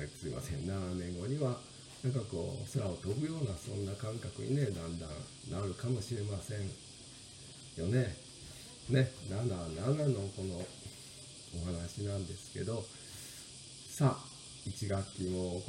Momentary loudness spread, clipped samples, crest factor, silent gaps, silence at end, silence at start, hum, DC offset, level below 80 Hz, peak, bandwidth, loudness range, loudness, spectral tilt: 15 LU; under 0.1%; 22 dB; none; 0 s; 0 s; none; under 0.1%; -62 dBFS; -16 dBFS; 15.5 kHz; 4 LU; -38 LUFS; -6 dB/octave